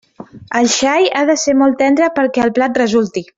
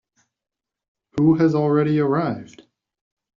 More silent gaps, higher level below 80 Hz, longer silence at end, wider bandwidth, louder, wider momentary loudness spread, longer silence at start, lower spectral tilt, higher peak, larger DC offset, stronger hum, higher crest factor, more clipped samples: neither; about the same, -54 dBFS vs -58 dBFS; second, 0.15 s vs 0.95 s; about the same, 7.8 kHz vs 7.2 kHz; first, -13 LUFS vs -19 LUFS; second, 3 LU vs 13 LU; second, 0.2 s vs 1.15 s; second, -3 dB/octave vs -8.5 dB/octave; first, -2 dBFS vs -6 dBFS; neither; neither; about the same, 12 dB vs 16 dB; neither